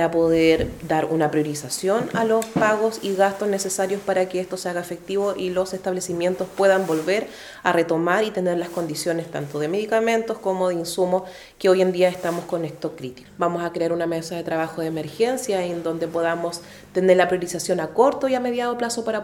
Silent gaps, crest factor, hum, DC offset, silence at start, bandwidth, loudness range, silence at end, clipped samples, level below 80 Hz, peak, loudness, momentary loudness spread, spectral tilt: none; 20 dB; none; under 0.1%; 0 s; 18.5 kHz; 3 LU; 0 s; under 0.1%; -54 dBFS; -2 dBFS; -22 LUFS; 9 LU; -4.5 dB/octave